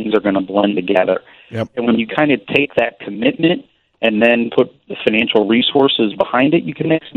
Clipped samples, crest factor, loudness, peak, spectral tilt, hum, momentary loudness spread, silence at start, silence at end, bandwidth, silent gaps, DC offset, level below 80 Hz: under 0.1%; 16 dB; -16 LUFS; 0 dBFS; -7.5 dB/octave; none; 7 LU; 0 s; 0.05 s; 6.4 kHz; none; under 0.1%; -56 dBFS